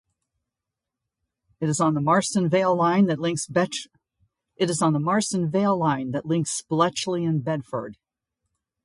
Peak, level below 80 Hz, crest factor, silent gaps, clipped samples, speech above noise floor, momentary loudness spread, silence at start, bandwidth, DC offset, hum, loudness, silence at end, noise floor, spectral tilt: -6 dBFS; -64 dBFS; 18 dB; none; under 0.1%; 63 dB; 8 LU; 1.6 s; 11.5 kHz; under 0.1%; none; -23 LUFS; 0.9 s; -86 dBFS; -5.5 dB/octave